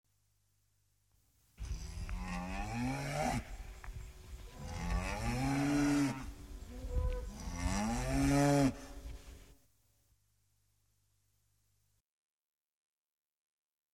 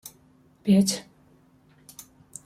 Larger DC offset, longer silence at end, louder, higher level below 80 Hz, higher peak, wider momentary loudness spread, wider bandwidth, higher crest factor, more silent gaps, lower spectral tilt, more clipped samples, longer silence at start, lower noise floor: neither; first, 4.4 s vs 1.45 s; second, -36 LUFS vs -24 LUFS; first, -46 dBFS vs -66 dBFS; second, -18 dBFS vs -10 dBFS; second, 20 LU vs 26 LU; about the same, 16 kHz vs 15 kHz; about the same, 22 dB vs 18 dB; neither; about the same, -5.5 dB/octave vs -5.5 dB/octave; neither; first, 1.6 s vs 0.05 s; first, -78 dBFS vs -59 dBFS